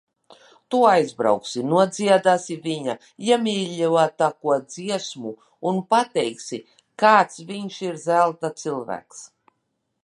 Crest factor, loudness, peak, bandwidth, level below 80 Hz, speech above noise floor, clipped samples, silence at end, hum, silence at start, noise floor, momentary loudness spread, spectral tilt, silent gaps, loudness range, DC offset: 20 dB; -21 LUFS; -2 dBFS; 11.5 kHz; -74 dBFS; 54 dB; under 0.1%; 0.8 s; none; 0.7 s; -75 dBFS; 15 LU; -4.5 dB/octave; none; 3 LU; under 0.1%